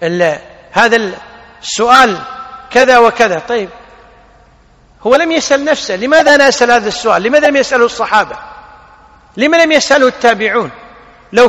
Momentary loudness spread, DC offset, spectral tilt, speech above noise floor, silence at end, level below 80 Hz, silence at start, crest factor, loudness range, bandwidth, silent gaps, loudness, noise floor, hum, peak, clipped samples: 15 LU; under 0.1%; -3 dB/octave; 35 dB; 0 s; -46 dBFS; 0 s; 12 dB; 3 LU; 13 kHz; none; -10 LUFS; -45 dBFS; none; 0 dBFS; 1%